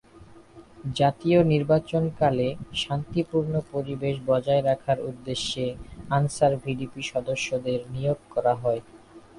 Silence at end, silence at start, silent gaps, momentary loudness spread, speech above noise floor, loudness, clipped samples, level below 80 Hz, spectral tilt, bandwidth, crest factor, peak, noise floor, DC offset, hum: 0.2 s; 0.15 s; none; 10 LU; 25 dB; -26 LUFS; under 0.1%; -52 dBFS; -6 dB/octave; 11.5 kHz; 18 dB; -8 dBFS; -50 dBFS; under 0.1%; none